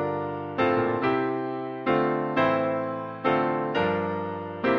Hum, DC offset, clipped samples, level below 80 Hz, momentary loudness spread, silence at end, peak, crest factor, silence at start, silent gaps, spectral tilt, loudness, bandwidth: none; under 0.1%; under 0.1%; -62 dBFS; 7 LU; 0 s; -10 dBFS; 16 dB; 0 s; none; -8 dB/octave; -26 LUFS; 6.6 kHz